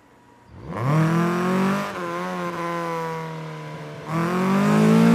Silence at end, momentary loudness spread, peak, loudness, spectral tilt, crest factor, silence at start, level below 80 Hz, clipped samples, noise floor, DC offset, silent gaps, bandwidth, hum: 0 s; 16 LU; -6 dBFS; -22 LUFS; -7 dB/octave; 16 dB; 0.5 s; -58 dBFS; under 0.1%; -52 dBFS; under 0.1%; none; 15.5 kHz; none